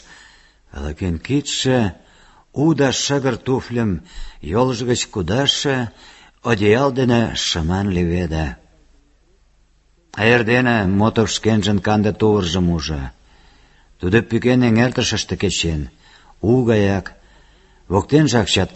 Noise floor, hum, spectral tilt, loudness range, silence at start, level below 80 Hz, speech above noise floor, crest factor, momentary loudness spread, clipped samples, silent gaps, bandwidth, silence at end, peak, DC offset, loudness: -56 dBFS; none; -5 dB/octave; 3 LU; 0.1 s; -36 dBFS; 39 dB; 18 dB; 12 LU; under 0.1%; none; 8.4 kHz; 0.05 s; -2 dBFS; under 0.1%; -18 LUFS